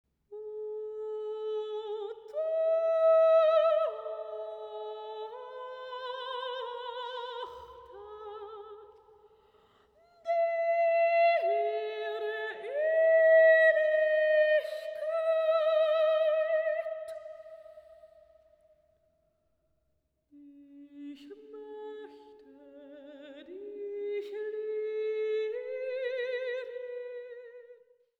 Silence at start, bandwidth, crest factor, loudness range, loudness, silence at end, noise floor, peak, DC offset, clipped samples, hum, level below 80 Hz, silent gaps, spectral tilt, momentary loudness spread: 0.3 s; 4.7 kHz; 18 dB; 21 LU; -29 LUFS; 0.45 s; -77 dBFS; -14 dBFS; under 0.1%; under 0.1%; none; -78 dBFS; none; -3 dB/octave; 24 LU